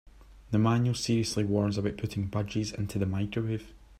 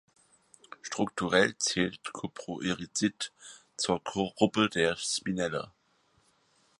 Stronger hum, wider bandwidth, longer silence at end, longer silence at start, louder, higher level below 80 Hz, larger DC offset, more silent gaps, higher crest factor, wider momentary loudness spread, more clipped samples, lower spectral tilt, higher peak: neither; first, 14 kHz vs 11.5 kHz; second, 0.05 s vs 1.1 s; second, 0.2 s vs 0.85 s; about the same, -30 LUFS vs -30 LUFS; first, -52 dBFS vs -64 dBFS; neither; neither; second, 16 dB vs 24 dB; second, 7 LU vs 13 LU; neither; first, -6 dB/octave vs -3.5 dB/octave; second, -12 dBFS vs -8 dBFS